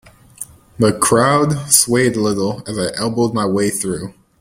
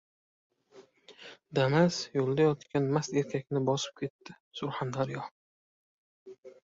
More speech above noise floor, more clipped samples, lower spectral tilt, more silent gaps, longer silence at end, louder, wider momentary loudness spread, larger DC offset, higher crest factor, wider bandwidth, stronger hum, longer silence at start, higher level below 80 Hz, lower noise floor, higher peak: second, 21 dB vs 29 dB; neither; second, -4 dB/octave vs -6 dB/octave; second, none vs 4.10-4.19 s, 4.40-4.51 s, 5.31-6.26 s, 6.38-6.43 s; first, 0.3 s vs 0.15 s; first, -15 LUFS vs -31 LUFS; about the same, 20 LU vs 19 LU; neither; about the same, 16 dB vs 20 dB; first, 16.5 kHz vs 7.8 kHz; neither; second, 0.4 s vs 0.75 s; first, -48 dBFS vs -70 dBFS; second, -36 dBFS vs -59 dBFS; first, 0 dBFS vs -12 dBFS